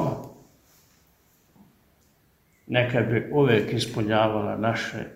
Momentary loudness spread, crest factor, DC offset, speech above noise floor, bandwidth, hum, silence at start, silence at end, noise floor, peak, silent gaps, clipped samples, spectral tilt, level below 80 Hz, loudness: 9 LU; 22 dB; under 0.1%; 40 dB; 15.5 kHz; none; 0 s; 0 s; -63 dBFS; -6 dBFS; none; under 0.1%; -6.5 dB/octave; -58 dBFS; -24 LUFS